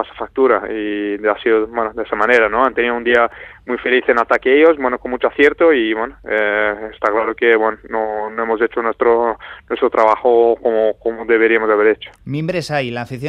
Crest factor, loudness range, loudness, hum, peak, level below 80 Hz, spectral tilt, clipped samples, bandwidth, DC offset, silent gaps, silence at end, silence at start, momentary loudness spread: 16 dB; 2 LU; -16 LUFS; none; 0 dBFS; -48 dBFS; -6 dB/octave; under 0.1%; 9.8 kHz; under 0.1%; none; 0 s; 0 s; 9 LU